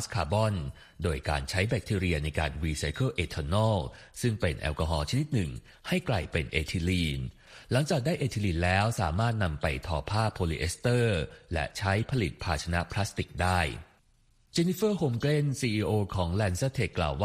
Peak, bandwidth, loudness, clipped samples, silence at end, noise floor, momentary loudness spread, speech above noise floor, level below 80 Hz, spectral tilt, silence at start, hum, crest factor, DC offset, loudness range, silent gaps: -12 dBFS; 15 kHz; -30 LUFS; under 0.1%; 0 s; -65 dBFS; 6 LU; 36 dB; -42 dBFS; -5.5 dB/octave; 0 s; none; 18 dB; under 0.1%; 2 LU; none